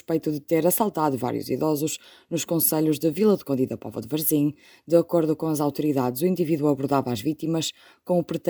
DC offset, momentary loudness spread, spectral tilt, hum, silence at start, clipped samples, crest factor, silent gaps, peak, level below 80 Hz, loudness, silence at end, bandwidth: under 0.1%; 7 LU; -5.5 dB/octave; none; 0.1 s; under 0.1%; 18 dB; none; -6 dBFS; -66 dBFS; -24 LUFS; 0 s; over 20 kHz